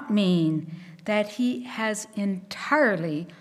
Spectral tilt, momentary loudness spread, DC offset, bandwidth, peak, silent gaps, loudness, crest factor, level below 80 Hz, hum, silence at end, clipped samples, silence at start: -5.5 dB/octave; 10 LU; under 0.1%; 14 kHz; -8 dBFS; none; -26 LUFS; 18 dB; -74 dBFS; none; 0.05 s; under 0.1%; 0 s